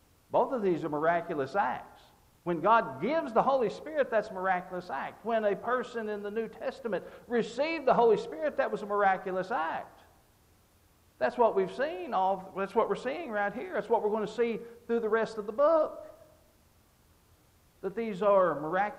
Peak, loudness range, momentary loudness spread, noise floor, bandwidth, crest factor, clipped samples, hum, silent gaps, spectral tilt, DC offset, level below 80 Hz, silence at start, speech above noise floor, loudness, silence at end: -12 dBFS; 3 LU; 11 LU; -64 dBFS; 15 kHz; 18 dB; under 0.1%; none; none; -6.5 dB/octave; under 0.1%; -68 dBFS; 0.3 s; 35 dB; -30 LUFS; 0 s